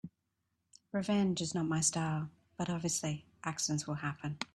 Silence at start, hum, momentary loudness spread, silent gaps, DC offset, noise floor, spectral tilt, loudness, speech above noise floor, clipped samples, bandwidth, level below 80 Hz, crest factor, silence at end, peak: 0.05 s; none; 10 LU; none; under 0.1%; -83 dBFS; -4 dB/octave; -35 LUFS; 48 dB; under 0.1%; 13.5 kHz; -70 dBFS; 20 dB; 0.1 s; -18 dBFS